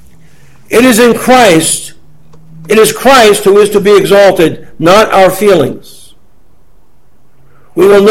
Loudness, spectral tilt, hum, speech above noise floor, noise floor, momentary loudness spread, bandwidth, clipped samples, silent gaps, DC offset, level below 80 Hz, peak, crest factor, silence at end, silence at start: -6 LUFS; -4 dB/octave; none; 43 dB; -49 dBFS; 8 LU; 17 kHz; 3%; none; 3%; -40 dBFS; 0 dBFS; 8 dB; 0 s; 0.7 s